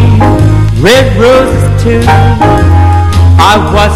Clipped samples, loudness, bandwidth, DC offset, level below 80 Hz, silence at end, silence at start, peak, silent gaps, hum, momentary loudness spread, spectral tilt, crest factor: 8%; -6 LUFS; 14.5 kHz; under 0.1%; -14 dBFS; 0 s; 0 s; 0 dBFS; none; none; 3 LU; -6.5 dB/octave; 4 dB